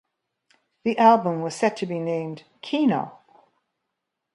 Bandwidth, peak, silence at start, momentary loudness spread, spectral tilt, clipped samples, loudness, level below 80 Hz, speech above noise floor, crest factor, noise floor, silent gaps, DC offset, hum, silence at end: 11.5 kHz; -4 dBFS; 0.85 s; 16 LU; -6 dB/octave; under 0.1%; -23 LUFS; -74 dBFS; 59 dB; 22 dB; -81 dBFS; none; under 0.1%; none; 1.25 s